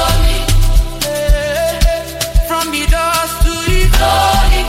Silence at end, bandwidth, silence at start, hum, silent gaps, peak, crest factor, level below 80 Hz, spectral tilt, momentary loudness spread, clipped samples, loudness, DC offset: 0 s; 16.5 kHz; 0 s; none; none; 0 dBFS; 12 dB; -14 dBFS; -4 dB/octave; 5 LU; under 0.1%; -14 LUFS; under 0.1%